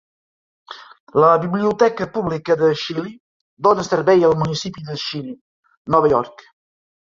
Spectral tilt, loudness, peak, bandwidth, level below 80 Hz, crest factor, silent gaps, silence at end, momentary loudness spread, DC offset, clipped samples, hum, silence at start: -6 dB/octave; -18 LUFS; -2 dBFS; 7.6 kHz; -54 dBFS; 18 dB; 1.00-1.07 s, 3.20-3.57 s, 5.41-5.63 s, 5.77-5.85 s; 0.75 s; 20 LU; under 0.1%; under 0.1%; none; 0.7 s